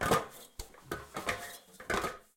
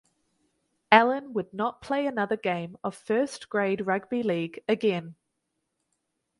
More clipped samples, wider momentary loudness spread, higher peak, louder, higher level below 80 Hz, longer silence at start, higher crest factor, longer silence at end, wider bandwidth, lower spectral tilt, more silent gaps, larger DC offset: neither; first, 16 LU vs 12 LU; second, -16 dBFS vs -2 dBFS; second, -37 LUFS vs -27 LUFS; first, -54 dBFS vs -70 dBFS; second, 0 s vs 0.9 s; second, 20 dB vs 26 dB; second, 0.15 s vs 1.3 s; first, 17 kHz vs 11.5 kHz; second, -3.5 dB/octave vs -5.5 dB/octave; neither; neither